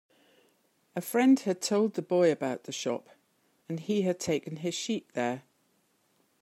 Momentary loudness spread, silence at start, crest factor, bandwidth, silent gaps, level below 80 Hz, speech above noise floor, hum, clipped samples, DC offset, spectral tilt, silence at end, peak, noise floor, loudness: 14 LU; 0.95 s; 18 dB; 16 kHz; none; -78 dBFS; 43 dB; none; under 0.1%; under 0.1%; -5 dB/octave; 1 s; -14 dBFS; -71 dBFS; -30 LUFS